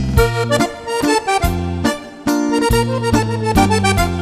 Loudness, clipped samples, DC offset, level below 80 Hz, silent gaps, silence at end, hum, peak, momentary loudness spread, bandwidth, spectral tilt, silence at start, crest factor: -16 LUFS; under 0.1%; under 0.1%; -26 dBFS; none; 0 s; none; 0 dBFS; 5 LU; 14 kHz; -5 dB/octave; 0 s; 16 dB